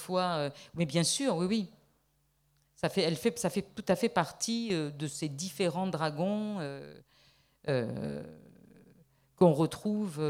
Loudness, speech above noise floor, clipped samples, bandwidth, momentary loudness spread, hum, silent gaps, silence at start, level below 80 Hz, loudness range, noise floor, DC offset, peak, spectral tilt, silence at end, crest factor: -32 LUFS; 42 dB; under 0.1%; 16 kHz; 11 LU; none; none; 0 s; -68 dBFS; 4 LU; -73 dBFS; under 0.1%; -10 dBFS; -5 dB/octave; 0 s; 22 dB